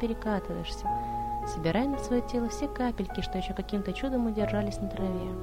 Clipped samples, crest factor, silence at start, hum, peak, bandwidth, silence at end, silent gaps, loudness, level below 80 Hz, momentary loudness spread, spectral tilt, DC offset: under 0.1%; 16 dB; 0 s; none; -14 dBFS; 16 kHz; 0 s; none; -31 LUFS; -40 dBFS; 5 LU; -6.5 dB/octave; under 0.1%